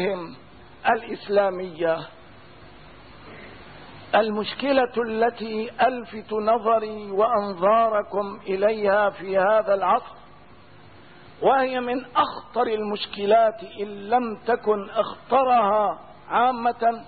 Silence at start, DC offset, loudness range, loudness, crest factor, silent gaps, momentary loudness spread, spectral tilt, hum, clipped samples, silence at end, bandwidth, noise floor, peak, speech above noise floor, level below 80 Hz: 0 s; 0.3%; 5 LU; -23 LUFS; 16 dB; none; 14 LU; -9.5 dB/octave; none; under 0.1%; 0 s; 4.8 kHz; -49 dBFS; -8 dBFS; 27 dB; -60 dBFS